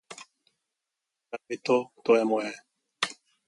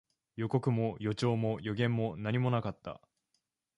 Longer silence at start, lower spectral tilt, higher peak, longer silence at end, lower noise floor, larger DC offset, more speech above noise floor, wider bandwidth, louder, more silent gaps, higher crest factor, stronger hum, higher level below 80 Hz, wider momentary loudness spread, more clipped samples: second, 0.1 s vs 0.35 s; second, -4 dB/octave vs -7.5 dB/octave; first, -10 dBFS vs -14 dBFS; second, 0.35 s vs 0.8 s; first, -86 dBFS vs -81 dBFS; neither; first, 60 dB vs 49 dB; about the same, 11.5 kHz vs 10.5 kHz; first, -28 LUFS vs -33 LUFS; neither; about the same, 20 dB vs 18 dB; neither; second, -82 dBFS vs -64 dBFS; first, 22 LU vs 15 LU; neither